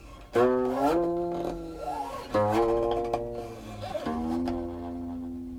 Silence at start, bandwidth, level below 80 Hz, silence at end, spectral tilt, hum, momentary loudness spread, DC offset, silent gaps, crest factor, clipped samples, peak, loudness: 0 s; 16.5 kHz; -48 dBFS; 0 s; -7 dB/octave; none; 12 LU; under 0.1%; none; 16 dB; under 0.1%; -12 dBFS; -29 LUFS